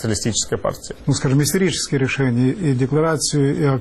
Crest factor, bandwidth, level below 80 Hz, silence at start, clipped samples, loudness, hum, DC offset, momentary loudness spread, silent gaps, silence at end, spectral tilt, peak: 12 dB; 14.5 kHz; -44 dBFS; 0 s; under 0.1%; -19 LUFS; none; under 0.1%; 5 LU; none; 0 s; -5 dB/octave; -6 dBFS